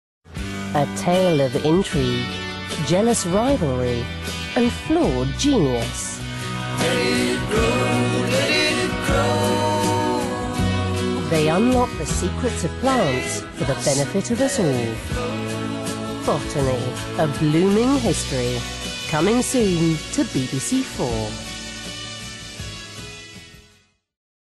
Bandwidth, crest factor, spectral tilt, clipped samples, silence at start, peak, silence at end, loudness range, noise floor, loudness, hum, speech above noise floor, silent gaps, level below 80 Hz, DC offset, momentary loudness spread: 12.5 kHz; 12 dB; -5 dB/octave; under 0.1%; 0.3 s; -10 dBFS; 0.9 s; 3 LU; -58 dBFS; -21 LUFS; none; 38 dB; none; -38 dBFS; under 0.1%; 12 LU